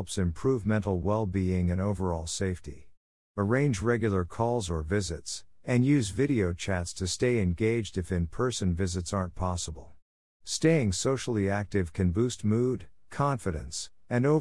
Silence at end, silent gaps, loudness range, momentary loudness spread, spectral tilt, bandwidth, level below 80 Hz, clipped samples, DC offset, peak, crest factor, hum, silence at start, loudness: 0 s; 2.97-3.34 s, 10.02-10.40 s; 2 LU; 9 LU; -6 dB/octave; 12 kHz; -50 dBFS; under 0.1%; 0.3%; -12 dBFS; 18 dB; none; 0 s; -29 LUFS